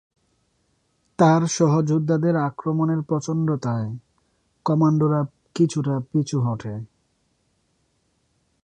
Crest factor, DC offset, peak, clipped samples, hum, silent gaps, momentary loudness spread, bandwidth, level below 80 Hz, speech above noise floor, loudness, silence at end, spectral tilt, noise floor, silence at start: 18 dB; under 0.1%; -4 dBFS; under 0.1%; none; none; 13 LU; 9.6 kHz; -62 dBFS; 48 dB; -22 LUFS; 1.8 s; -7 dB/octave; -68 dBFS; 1.2 s